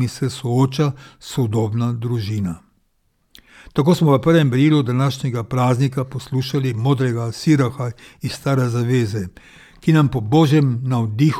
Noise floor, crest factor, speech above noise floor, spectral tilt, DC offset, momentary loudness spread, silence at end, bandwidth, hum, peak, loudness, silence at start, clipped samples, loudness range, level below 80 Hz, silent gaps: -64 dBFS; 16 dB; 46 dB; -7 dB/octave; under 0.1%; 11 LU; 0 s; 14.5 kHz; none; -2 dBFS; -19 LUFS; 0 s; under 0.1%; 4 LU; -50 dBFS; none